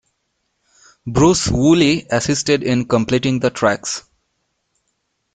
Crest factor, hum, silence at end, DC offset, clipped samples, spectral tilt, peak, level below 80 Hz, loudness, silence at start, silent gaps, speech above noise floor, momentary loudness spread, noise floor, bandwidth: 18 dB; none; 1.35 s; under 0.1%; under 0.1%; -5 dB/octave; 0 dBFS; -40 dBFS; -16 LUFS; 1.05 s; none; 55 dB; 9 LU; -70 dBFS; 9.4 kHz